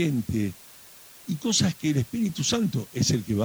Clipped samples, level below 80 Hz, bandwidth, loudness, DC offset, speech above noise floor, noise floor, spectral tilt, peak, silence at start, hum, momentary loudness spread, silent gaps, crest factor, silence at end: under 0.1%; -54 dBFS; over 20 kHz; -26 LUFS; under 0.1%; 23 dB; -49 dBFS; -4.5 dB/octave; -10 dBFS; 0 s; none; 21 LU; none; 16 dB; 0 s